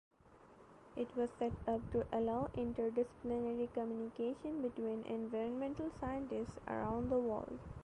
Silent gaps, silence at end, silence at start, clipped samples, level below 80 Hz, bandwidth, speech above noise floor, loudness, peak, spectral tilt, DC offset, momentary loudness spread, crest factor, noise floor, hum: none; 0 s; 0.3 s; under 0.1%; -60 dBFS; 10 kHz; 23 dB; -41 LUFS; -26 dBFS; -8 dB/octave; under 0.1%; 6 LU; 14 dB; -63 dBFS; none